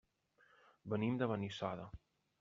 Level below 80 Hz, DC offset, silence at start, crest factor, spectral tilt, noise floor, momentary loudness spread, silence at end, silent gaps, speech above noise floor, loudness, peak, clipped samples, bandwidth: -68 dBFS; under 0.1%; 0.85 s; 20 dB; -6 dB/octave; -74 dBFS; 19 LU; 0.45 s; none; 34 dB; -41 LUFS; -24 dBFS; under 0.1%; 7.4 kHz